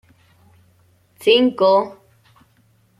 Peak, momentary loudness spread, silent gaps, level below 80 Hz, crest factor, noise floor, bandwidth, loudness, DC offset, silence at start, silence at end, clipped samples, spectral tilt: -2 dBFS; 9 LU; none; -64 dBFS; 18 dB; -58 dBFS; 14 kHz; -16 LUFS; under 0.1%; 1.2 s; 1.05 s; under 0.1%; -5 dB/octave